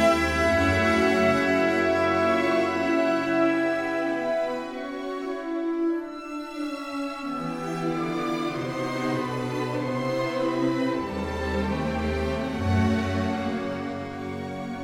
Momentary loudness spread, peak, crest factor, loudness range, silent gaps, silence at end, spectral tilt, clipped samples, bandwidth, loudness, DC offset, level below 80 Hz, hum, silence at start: 11 LU; -10 dBFS; 16 dB; 8 LU; none; 0 s; -6 dB/octave; under 0.1%; 15.5 kHz; -26 LUFS; under 0.1%; -44 dBFS; none; 0 s